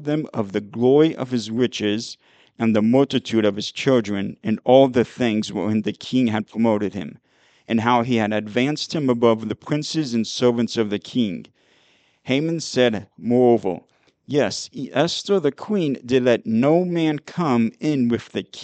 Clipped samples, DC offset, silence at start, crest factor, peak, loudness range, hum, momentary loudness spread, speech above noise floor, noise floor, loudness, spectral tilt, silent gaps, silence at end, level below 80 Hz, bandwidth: under 0.1%; under 0.1%; 0 s; 20 dB; -2 dBFS; 3 LU; none; 9 LU; 39 dB; -60 dBFS; -21 LUFS; -6 dB/octave; none; 0 s; -64 dBFS; 8.8 kHz